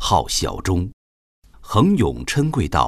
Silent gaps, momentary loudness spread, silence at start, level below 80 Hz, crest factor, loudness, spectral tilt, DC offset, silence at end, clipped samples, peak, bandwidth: 0.93-1.42 s; 6 LU; 0 s; -36 dBFS; 18 dB; -20 LUFS; -5 dB/octave; under 0.1%; 0 s; under 0.1%; -2 dBFS; 14 kHz